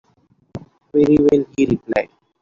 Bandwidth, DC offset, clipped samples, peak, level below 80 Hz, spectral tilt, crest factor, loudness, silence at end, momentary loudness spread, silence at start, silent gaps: 7.4 kHz; under 0.1%; under 0.1%; -2 dBFS; -46 dBFS; -7.5 dB/octave; 16 dB; -17 LUFS; 0.35 s; 23 LU; 0.55 s; none